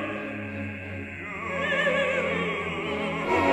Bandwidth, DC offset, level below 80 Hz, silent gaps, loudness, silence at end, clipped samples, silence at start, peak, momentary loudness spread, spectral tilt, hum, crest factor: 12.5 kHz; under 0.1%; -56 dBFS; none; -28 LUFS; 0 s; under 0.1%; 0 s; -12 dBFS; 11 LU; -5.5 dB/octave; none; 16 dB